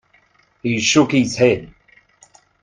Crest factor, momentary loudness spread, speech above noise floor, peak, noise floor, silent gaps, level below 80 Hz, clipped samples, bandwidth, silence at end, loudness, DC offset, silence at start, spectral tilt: 20 dB; 10 LU; 41 dB; 0 dBFS; -57 dBFS; none; -54 dBFS; under 0.1%; 9.6 kHz; 0.95 s; -17 LUFS; under 0.1%; 0.65 s; -4 dB/octave